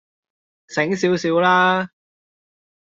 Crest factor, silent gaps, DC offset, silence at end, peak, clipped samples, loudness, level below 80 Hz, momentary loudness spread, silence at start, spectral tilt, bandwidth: 18 dB; none; under 0.1%; 0.95 s; -4 dBFS; under 0.1%; -18 LUFS; -66 dBFS; 11 LU; 0.7 s; -5 dB/octave; 7.8 kHz